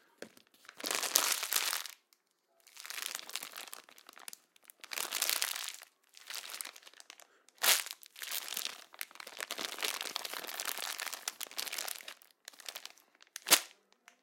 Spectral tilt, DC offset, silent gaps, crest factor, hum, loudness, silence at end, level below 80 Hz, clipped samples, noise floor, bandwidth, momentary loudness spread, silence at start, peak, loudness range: 2.5 dB/octave; under 0.1%; none; 38 dB; none; -35 LUFS; 0.5 s; under -90 dBFS; under 0.1%; -74 dBFS; 17 kHz; 24 LU; 0.2 s; -2 dBFS; 5 LU